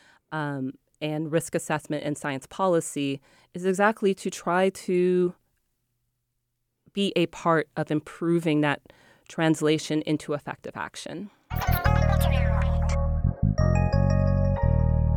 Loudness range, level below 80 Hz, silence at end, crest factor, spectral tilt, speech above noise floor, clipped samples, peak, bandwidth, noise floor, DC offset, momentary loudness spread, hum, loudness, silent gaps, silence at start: 5 LU; -34 dBFS; 0 s; 18 dB; -6.5 dB/octave; 52 dB; under 0.1%; -8 dBFS; 19 kHz; -78 dBFS; under 0.1%; 12 LU; none; -26 LUFS; none; 0.3 s